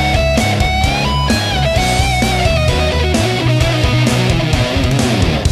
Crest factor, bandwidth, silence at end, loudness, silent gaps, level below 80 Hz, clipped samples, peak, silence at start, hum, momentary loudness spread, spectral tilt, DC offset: 12 dB; 14.5 kHz; 0 s; -14 LUFS; none; -22 dBFS; under 0.1%; 0 dBFS; 0 s; none; 1 LU; -5 dB/octave; under 0.1%